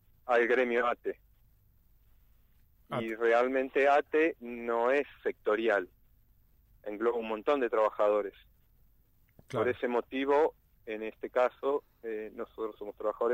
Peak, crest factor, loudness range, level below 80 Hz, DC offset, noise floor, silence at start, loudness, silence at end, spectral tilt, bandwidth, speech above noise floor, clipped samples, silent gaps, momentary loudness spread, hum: -14 dBFS; 18 dB; 4 LU; -66 dBFS; under 0.1%; -66 dBFS; 0.25 s; -31 LUFS; 0 s; -6 dB/octave; 15.5 kHz; 35 dB; under 0.1%; none; 13 LU; none